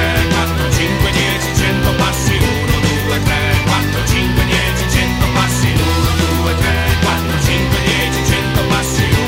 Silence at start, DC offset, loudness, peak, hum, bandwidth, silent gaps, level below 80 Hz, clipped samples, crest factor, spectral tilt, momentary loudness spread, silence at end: 0 s; under 0.1%; -14 LUFS; 0 dBFS; none; 16.5 kHz; none; -22 dBFS; under 0.1%; 14 dB; -4.5 dB/octave; 1 LU; 0 s